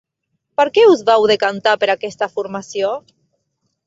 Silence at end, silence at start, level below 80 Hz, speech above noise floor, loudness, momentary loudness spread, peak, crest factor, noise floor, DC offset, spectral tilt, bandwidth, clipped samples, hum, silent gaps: 0.85 s; 0.6 s; -64 dBFS; 58 dB; -16 LUFS; 14 LU; 0 dBFS; 16 dB; -73 dBFS; under 0.1%; -4 dB/octave; 7.8 kHz; under 0.1%; none; none